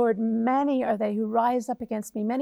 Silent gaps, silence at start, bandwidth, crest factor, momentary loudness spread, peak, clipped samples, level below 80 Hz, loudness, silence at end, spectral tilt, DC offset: none; 0 s; 14 kHz; 14 dB; 7 LU; -12 dBFS; under 0.1%; -66 dBFS; -26 LUFS; 0 s; -6.5 dB/octave; under 0.1%